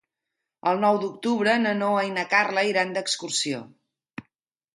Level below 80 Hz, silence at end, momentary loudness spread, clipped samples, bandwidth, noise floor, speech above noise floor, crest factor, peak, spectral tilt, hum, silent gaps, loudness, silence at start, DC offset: -74 dBFS; 0.55 s; 17 LU; under 0.1%; 11.5 kHz; -84 dBFS; 60 dB; 18 dB; -6 dBFS; -3.5 dB/octave; none; none; -23 LUFS; 0.65 s; under 0.1%